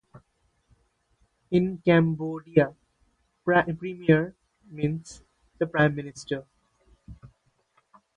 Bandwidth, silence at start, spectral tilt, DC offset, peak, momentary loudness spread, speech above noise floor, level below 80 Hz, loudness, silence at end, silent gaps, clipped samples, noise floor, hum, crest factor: 10 kHz; 1.5 s; -7.5 dB/octave; under 0.1%; -6 dBFS; 14 LU; 46 dB; -58 dBFS; -26 LUFS; 0.9 s; none; under 0.1%; -70 dBFS; none; 22 dB